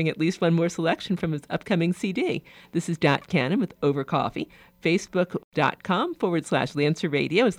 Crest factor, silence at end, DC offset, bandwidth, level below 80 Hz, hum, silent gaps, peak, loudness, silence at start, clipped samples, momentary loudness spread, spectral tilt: 18 dB; 0 s; under 0.1%; 15 kHz; -60 dBFS; none; 5.44-5.52 s; -8 dBFS; -25 LUFS; 0 s; under 0.1%; 6 LU; -6 dB/octave